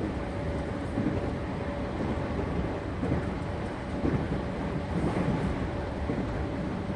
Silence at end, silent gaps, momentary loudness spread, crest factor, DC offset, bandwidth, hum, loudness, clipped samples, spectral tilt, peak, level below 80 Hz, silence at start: 0 s; none; 4 LU; 16 dB; under 0.1%; 11 kHz; none; -32 LUFS; under 0.1%; -8 dB/octave; -16 dBFS; -38 dBFS; 0 s